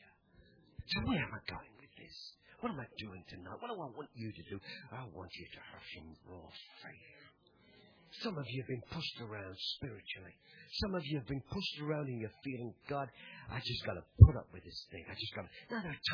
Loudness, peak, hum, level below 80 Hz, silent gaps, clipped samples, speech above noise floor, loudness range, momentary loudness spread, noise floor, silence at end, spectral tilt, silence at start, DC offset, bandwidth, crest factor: -38 LUFS; -6 dBFS; none; -46 dBFS; none; under 0.1%; 29 dB; 17 LU; 16 LU; -66 dBFS; 0 s; -5.5 dB/octave; 0.8 s; under 0.1%; 5.4 kHz; 32 dB